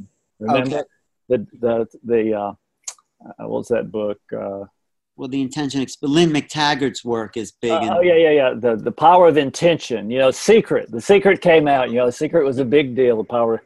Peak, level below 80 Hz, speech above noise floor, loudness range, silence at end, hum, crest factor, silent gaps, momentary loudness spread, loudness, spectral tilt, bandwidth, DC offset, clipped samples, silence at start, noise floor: 0 dBFS; -56 dBFS; 21 dB; 10 LU; 0.05 s; none; 18 dB; none; 15 LU; -18 LUFS; -5 dB/octave; 12 kHz; under 0.1%; under 0.1%; 0 s; -38 dBFS